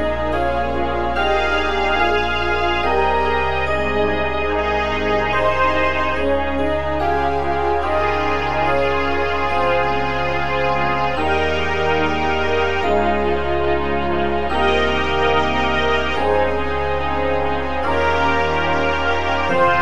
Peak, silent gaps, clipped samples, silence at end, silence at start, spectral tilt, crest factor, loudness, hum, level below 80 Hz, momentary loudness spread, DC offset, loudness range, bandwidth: -2 dBFS; none; under 0.1%; 0 s; 0 s; -5.5 dB/octave; 14 dB; -18 LUFS; none; -32 dBFS; 3 LU; 5%; 1 LU; 11 kHz